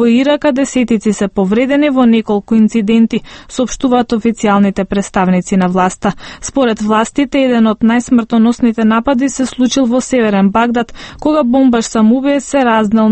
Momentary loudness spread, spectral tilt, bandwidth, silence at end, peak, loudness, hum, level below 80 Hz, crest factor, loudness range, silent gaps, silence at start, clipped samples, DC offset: 5 LU; -5.5 dB/octave; 8.8 kHz; 0 s; 0 dBFS; -12 LUFS; none; -40 dBFS; 12 dB; 2 LU; none; 0 s; under 0.1%; under 0.1%